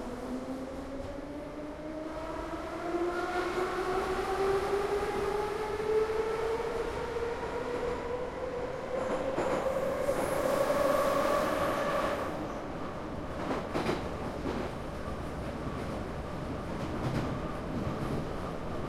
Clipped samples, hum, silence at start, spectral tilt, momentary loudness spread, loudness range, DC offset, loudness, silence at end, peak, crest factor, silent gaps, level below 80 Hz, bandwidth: under 0.1%; none; 0 s; -6 dB/octave; 9 LU; 6 LU; under 0.1%; -33 LUFS; 0 s; -16 dBFS; 16 dB; none; -48 dBFS; 16.5 kHz